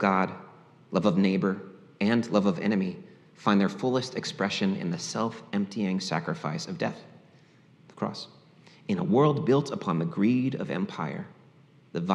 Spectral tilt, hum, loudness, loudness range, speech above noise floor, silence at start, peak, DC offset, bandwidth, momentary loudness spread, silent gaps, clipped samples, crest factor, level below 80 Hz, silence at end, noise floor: -6.5 dB/octave; none; -28 LUFS; 6 LU; 30 dB; 0 s; -8 dBFS; under 0.1%; 10.5 kHz; 13 LU; none; under 0.1%; 20 dB; -78 dBFS; 0 s; -57 dBFS